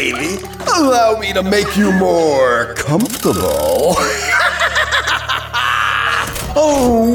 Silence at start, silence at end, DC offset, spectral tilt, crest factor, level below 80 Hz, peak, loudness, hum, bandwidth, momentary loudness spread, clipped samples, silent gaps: 0 s; 0 s; under 0.1%; -4 dB/octave; 12 dB; -34 dBFS; -2 dBFS; -14 LUFS; none; 19 kHz; 5 LU; under 0.1%; none